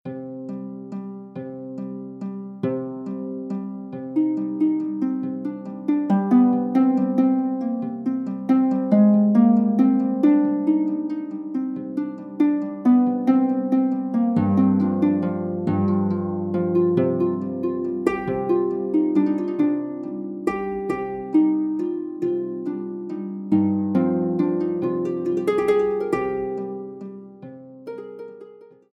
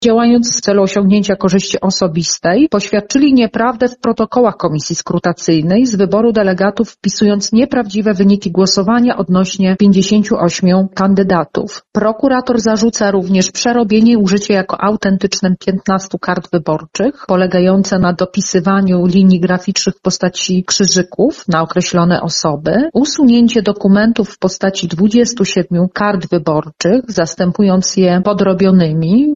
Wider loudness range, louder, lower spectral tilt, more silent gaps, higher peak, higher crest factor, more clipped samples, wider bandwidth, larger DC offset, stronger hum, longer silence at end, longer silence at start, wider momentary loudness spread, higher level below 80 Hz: first, 7 LU vs 2 LU; second, -22 LUFS vs -12 LUFS; first, -10 dB/octave vs -5 dB/octave; neither; second, -6 dBFS vs 0 dBFS; about the same, 16 dB vs 12 dB; neither; second, 5.8 kHz vs 7.8 kHz; neither; neither; first, 0.25 s vs 0 s; about the same, 0.05 s vs 0 s; first, 15 LU vs 6 LU; second, -62 dBFS vs -44 dBFS